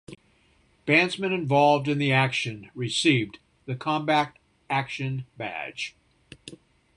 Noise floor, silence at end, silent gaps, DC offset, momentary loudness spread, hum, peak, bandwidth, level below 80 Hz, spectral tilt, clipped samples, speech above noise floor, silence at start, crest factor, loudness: -63 dBFS; 0.4 s; none; under 0.1%; 16 LU; none; -6 dBFS; 11 kHz; -64 dBFS; -5 dB/octave; under 0.1%; 38 dB; 0.1 s; 20 dB; -25 LUFS